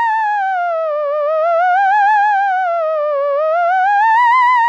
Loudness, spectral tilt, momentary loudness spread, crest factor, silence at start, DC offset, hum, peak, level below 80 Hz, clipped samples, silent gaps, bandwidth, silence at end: -14 LUFS; 3 dB/octave; 7 LU; 8 dB; 0 s; under 0.1%; none; -4 dBFS; under -90 dBFS; under 0.1%; none; 8.2 kHz; 0 s